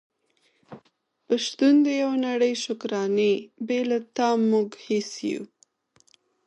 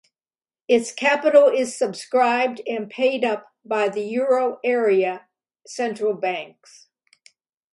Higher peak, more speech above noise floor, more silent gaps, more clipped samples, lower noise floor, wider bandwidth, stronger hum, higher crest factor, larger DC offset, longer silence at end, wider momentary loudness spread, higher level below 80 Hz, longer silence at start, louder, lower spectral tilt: second, -10 dBFS vs -2 dBFS; second, 45 dB vs over 69 dB; neither; neither; second, -68 dBFS vs under -90 dBFS; about the same, 10.5 kHz vs 11.5 kHz; neither; about the same, 16 dB vs 20 dB; neither; second, 1 s vs 1.25 s; second, 10 LU vs 13 LU; about the same, -78 dBFS vs -76 dBFS; about the same, 0.7 s vs 0.7 s; second, -24 LUFS vs -21 LUFS; about the same, -4.5 dB/octave vs -3.5 dB/octave